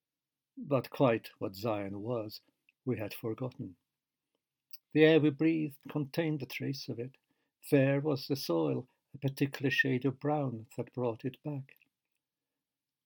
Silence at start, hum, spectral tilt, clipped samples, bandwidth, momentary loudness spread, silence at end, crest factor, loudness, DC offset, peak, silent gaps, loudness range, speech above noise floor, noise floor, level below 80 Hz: 0.55 s; none; -7 dB/octave; under 0.1%; 19 kHz; 16 LU; 1.4 s; 22 dB; -33 LUFS; under 0.1%; -10 dBFS; none; 7 LU; over 58 dB; under -90 dBFS; -82 dBFS